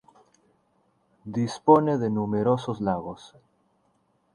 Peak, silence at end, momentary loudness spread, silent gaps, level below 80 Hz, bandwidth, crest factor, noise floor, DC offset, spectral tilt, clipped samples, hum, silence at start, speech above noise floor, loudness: -4 dBFS; 1.1 s; 19 LU; none; -60 dBFS; 10.5 kHz; 22 dB; -68 dBFS; under 0.1%; -7.5 dB/octave; under 0.1%; none; 1.25 s; 44 dB; -24 LUFS